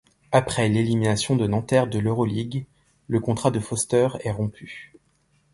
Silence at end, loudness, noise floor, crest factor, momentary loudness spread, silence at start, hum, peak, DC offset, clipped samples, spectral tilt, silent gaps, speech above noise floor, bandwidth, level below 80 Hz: 0.7 s; -23 LUFS; -65 dBFS; 20 dB; 10 LU; 0.3 s; none; -4 dBFS; under 0.1%; under 0.1%; -5.5 dB/octave; none; 42 dB; 11.5 kHz; -50 dBFS